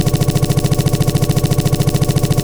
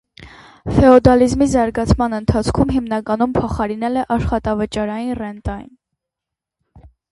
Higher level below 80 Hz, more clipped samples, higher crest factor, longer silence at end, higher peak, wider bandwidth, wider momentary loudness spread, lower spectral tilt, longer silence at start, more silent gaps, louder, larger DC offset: about the same, -26 dBFS vs -30 dBFS; neither; second, 10 dB vs 18 dB; second, 0 s vs 0.25 s; about the same, -2 dBFS vs 0 dBFS; first, over 20 kHz vs 11.5 kHz; second, 1 LU vs 14 LU; about the same, -6 dB/octave vs -7 dB/octave; second, 0 s vs 0.2 s; neither; about the same, -15 LUFS vs -16 LUFS; neither